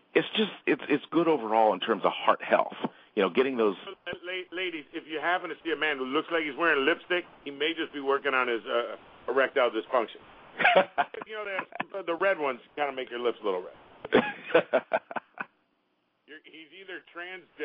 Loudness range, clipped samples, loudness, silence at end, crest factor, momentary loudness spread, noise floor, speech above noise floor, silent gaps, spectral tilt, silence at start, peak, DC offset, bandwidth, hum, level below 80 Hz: 4 LU; under 0.1%; -28 LUFS; 0 s; 22 dB; 16 LU; -74 dBFS; 45 dB; none; -7.5 dB/octave; 0.15 s; -6 dBFS; under 0.1%; 5.2 kHz; none; -74 dBFS